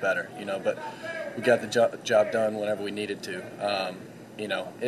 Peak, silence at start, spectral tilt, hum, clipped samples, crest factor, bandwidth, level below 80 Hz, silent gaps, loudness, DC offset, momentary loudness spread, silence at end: -8 dBFS; 0 s; -4 dB/octave; none; under 0.1%; 20 dB; 13 kHz; -76 dBFS; none; -28 LUFS; under 0.1%; 12 LU; 0 s